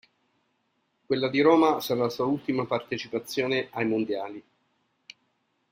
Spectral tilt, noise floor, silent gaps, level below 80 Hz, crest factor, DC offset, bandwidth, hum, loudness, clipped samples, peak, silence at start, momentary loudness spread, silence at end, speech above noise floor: -5.5 dB/octave; -74 dBFS; none; -70 dBFS; 22 dB; under 0.1%; 16 kHz; none; -26 LUFS; under 0.1%; -6 dBFS; 1.1 s; 11 LU; 1.3 s; 48 dB